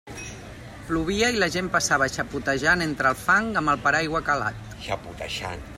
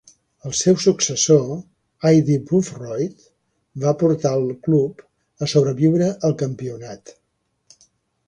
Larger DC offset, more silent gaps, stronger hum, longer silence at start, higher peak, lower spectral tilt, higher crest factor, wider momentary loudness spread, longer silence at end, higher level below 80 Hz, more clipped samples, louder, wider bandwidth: neither; neither; neither; second, 0.05 s vs 0.45 s; second, -8 dBFS vs -2 dBFS; second, -3.5 dB/octave vs -5.5 dB/octave; about the same, 18 dB vs 18 dB; about the same, 16 LU vs 15 LU; second, 0 s vs 1.3 s; first, -46 dBFS vs -58 dBFS; neither; second, -23 LUFS vs -19 LUFS; first, 16 kHz vs 10 kHz